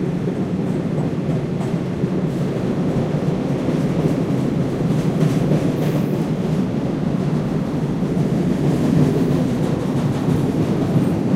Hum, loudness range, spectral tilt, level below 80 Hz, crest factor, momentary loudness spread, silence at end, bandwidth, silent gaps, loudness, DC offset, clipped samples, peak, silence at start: none; 2 LU; -8.5 dB/octave; -42 dBFS; 14 dB; 4 LU; 0 s; 15 kHz; none; -20 LUFS; under 0.1%; under 0.1%; -4 dBFS; 0 s